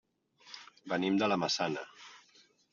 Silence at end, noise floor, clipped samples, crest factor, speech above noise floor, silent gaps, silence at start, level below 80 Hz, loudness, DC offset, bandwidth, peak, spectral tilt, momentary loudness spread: 0.55 s; -65 dBFS; under 0.1%; 20 dB; 34 dB; none; 0.45 s; -78 dBFS; -32 LUFS; under 0.1%; 7.4 kHz; -16 dBFS; -3 dB/octave; 21 LU